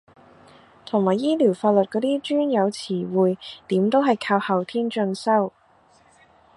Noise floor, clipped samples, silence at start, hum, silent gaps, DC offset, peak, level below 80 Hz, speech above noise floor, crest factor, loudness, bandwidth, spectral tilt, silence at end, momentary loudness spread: -57 dBFS; under 0.1%; 0.95 s; none; none; under 0.1%; -6 dBFS; -70 dBFS; 36 dB; 18 dB; -22 LUFS; 11.5 kHz; -6.5 dB/octave; 1.05 s; 6 LU